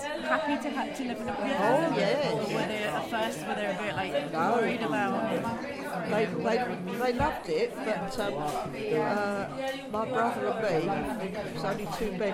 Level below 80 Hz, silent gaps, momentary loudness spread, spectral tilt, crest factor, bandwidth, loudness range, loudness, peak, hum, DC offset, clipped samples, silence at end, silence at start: -54 dBFS; none; 7 LU; -5.5 dB/octave; 18 dB; 16.5 kHz; 2 LU; -30 LUFS; -12 dBFS; none; under 0.1%; under 0.1%; 0 s; 0 s